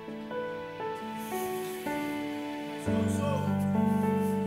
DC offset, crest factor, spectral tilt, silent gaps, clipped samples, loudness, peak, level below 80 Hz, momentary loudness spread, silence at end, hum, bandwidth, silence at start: under 0.1%; 14 dB; -6.5 dB/octave; none; under 0.1%; -32 LUFS; -16 dBFS; -60 dBFS; 9 LU; 0 s; none; 16 kHz; 0 s